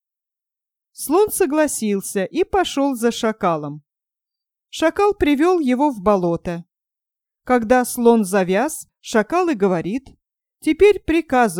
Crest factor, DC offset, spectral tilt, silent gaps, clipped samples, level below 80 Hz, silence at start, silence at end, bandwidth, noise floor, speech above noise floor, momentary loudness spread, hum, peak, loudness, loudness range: 18 dB; under 0.1%; -5 dB/octave; none; under 0.1%; -46 dBFS; 1 s; 0 s; 18.5 kHz; -87 dBFS; 70 dB; 11 LU; none; -2 dBFS; -18 LUFS; 2 LU